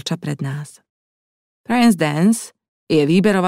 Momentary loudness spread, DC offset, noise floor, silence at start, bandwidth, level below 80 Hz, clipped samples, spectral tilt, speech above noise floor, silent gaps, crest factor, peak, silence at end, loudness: 15 LU; under 0.1%; under -90 dBFS; 0.05 s; 15.5 kHz; -58 dBFS; under 0.1%; -6 dB/octave; over 73 dB; 0.90-1.64 s, 2.68-2.87 s; 16 dB; -4 dBFS; 0 s; -17 LUFS